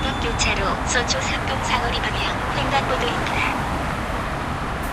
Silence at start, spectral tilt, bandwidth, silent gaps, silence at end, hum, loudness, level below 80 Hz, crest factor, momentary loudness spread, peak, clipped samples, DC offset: 0 s; -3.5 dB/octave; 15.5 kHz; none; 0 s; none; -22 LUFS; -32 dBFS; 16 dB; 6 LU; -6 dBFS; under 0.1%; under 0.1%